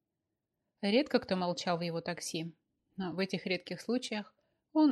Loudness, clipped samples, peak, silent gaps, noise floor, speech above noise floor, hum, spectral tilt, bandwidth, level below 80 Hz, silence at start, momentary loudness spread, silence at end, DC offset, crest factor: -35 LUFS; under 0.1%; -14 dBFS; none; -87 dBFS; 53 dB; none; -5 dB/octave; 12.5 kHz; -76 dBFS; 0.8 s; 11 LU; 0 s; under 0.1%; 20 dB